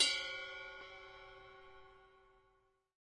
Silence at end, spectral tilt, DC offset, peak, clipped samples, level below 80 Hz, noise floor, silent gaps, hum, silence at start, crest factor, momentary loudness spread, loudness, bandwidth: 1 s; 1 dB/octave; under 0.1%; -18 dBFS; under 0.1%; -72 dBFS; -76 dBFS; none; none; 0 s; 26 dB; 22 LU; -41 LUFS; 11 kHz